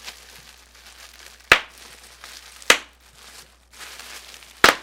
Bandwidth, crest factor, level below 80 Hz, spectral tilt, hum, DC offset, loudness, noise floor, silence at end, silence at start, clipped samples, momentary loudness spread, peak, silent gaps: 18 kHz; 26 dB; -52 dBFS; -0.5 dB/octave; none; under 0.1%; -18 LUFS; -48 dBFS; 0.05 s; 0.05 s; under 0.1%; 26 LU; 0 dBFS; none